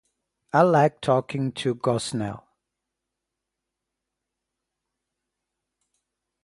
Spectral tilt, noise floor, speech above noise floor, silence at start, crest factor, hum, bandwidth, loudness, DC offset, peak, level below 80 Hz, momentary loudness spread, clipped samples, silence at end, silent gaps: -6 dB/octave; -84 dBFS; 62 dB; 0.55 s; 24 dB; none; 11.5 kHz; -23 LUFS; under 0.1%; -4 dBFS; -64 dBFS; 12 LU; under 0.1%; 4.05 s; none